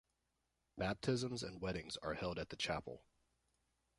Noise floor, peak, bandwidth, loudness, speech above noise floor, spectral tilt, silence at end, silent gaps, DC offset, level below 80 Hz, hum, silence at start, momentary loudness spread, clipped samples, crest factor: -86 dBFS; -24 dBFS; 11.5 kHz; -43 LUFS; 43 dB; -5 dB/octave; 1 s; none; under 0.1%; -64 dBFS; none; 0.75 s; 11 LU; under 0.1%; 20 dB